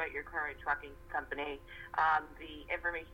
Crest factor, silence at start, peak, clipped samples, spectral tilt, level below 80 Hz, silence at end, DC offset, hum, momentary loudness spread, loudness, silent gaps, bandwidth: 20 dB; 0 s; -16 dBFS; under 0.1%; -5 dB/octave; -56 dBFS; 0 s; under 0.1%; none; 13 LU; -36 LUFS; none; 17 kHz